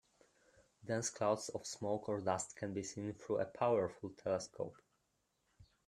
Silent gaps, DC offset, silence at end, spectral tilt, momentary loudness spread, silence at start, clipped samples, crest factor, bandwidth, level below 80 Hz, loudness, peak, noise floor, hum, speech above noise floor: none; under 0.1%; 0.25 s; -4.5 dB/octave; 10 LU; 0.85 s; under 0.1%; 20 dB; 13.5 kHz; -76 dBFS; -40 LUFS; -20 dBFS; -82 dBFS; none; 43 dB